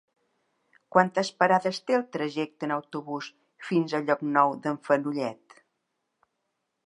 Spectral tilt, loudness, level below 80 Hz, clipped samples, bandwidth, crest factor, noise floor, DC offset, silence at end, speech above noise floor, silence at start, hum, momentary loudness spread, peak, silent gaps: -5.5 dB/octave; -27 LUFS; -78 dBFS; under 0.1%; 11 kHz; 24 dB; -80 dBFS; under 0.1%; 1.5 s; 54 dB; 0.95 s; none; 12 LU; -4 dBFS; none